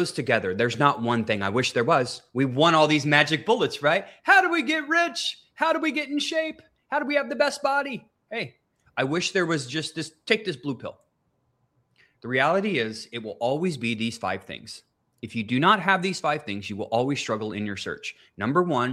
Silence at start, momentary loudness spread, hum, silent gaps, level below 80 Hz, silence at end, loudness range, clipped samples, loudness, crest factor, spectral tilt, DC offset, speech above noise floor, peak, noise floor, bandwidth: 0 s; 15 LU; none; none; -68 dBFS; 0 s; 7 LU; under 0.1%; -24 LUFS; 24 dB; -4.5 dB/octave; under 0.1%; 47 dB; 0 dBFS; -71 dBFS; 15.5 kHz